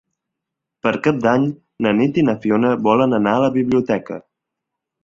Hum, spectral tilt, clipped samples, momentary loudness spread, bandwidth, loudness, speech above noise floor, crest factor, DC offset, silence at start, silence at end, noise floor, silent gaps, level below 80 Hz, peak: none; -7.5 dB/octave; under 0.1%; 8 LU; 7.6 kHz; -17 LUFS; 65 dB; 16 dB; under 0.1%; 0.85 s; 0.85 s; -82 dBFS; none; -56 dBFS; -2 dBFS